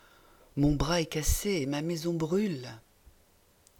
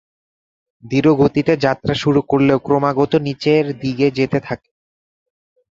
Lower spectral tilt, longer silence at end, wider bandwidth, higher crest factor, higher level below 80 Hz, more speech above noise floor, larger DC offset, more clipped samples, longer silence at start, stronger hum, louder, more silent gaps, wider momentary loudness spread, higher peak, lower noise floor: second, -5 dB/octave vs -7.5 dB/octave; second, 1 s vs 1.2 s; first, 19 kHz vs 7.6 kHz; about the same, 16 dB vs 16 dB; first, -40 dBFS vs -48 dBFS; second, 35 dB vs over 74 dB; neither; neither; second, 0.55 s vs 0.85 s; neither; second, -30 LUFS vs -16 LUFS; neither; first, 10 LU vs 7 LU; second, -14 dBFS vs 0 dBFS; second, -64 dBFS vs under -90 dBFS